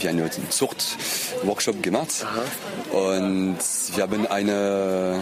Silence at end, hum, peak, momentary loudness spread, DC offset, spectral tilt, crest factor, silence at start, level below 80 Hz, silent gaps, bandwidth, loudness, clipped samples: 0 s; none; -8 dBFS; 4 LU; under 0.1%; -3.5 dB/octave; 16 dB; 0 s; -62 dBFS; none; 15.5 kHz; -24 LUFS; under 0.1%